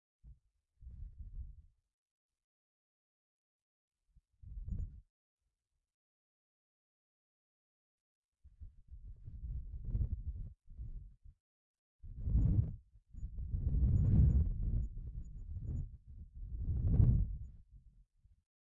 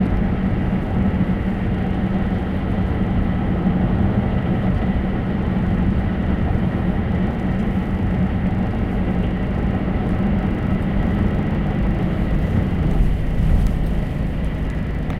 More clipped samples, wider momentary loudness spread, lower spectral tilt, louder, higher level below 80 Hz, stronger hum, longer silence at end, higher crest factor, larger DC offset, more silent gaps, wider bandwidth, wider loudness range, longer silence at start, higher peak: neither; first, 24 LU vs 3 LU; first, -14 dB/octave vs -9.5 dB/octave; second, -37 LUFS vs -21 LUFS; second, -42 dBFS vs -24 dBFS; neither; first, 0.85 s vs 0 s; first, 22 dB vs 14 dB; neither; first, 1.94-2.29 s, 2.44-3.91 s, 5.10-5.37 s, 5.94-8.32 s, 11.40-11.99 s vs none; second, 1.6 kHz vs 5.6 kHz; first, 23 LU vs 1 LU; first, 0.25 s vs 0 s; second, -16 dBFS vs -4 dBFS